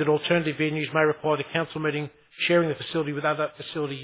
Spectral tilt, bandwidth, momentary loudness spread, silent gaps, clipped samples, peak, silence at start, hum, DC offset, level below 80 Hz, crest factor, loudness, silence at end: -10 dB/octave; 4 kHz; 8 LU; none; under 0.1%; -8 dBFS; 0 s; none; under 0.1%; -68 dBFS; 18 dB; -25 LUFS; 0 s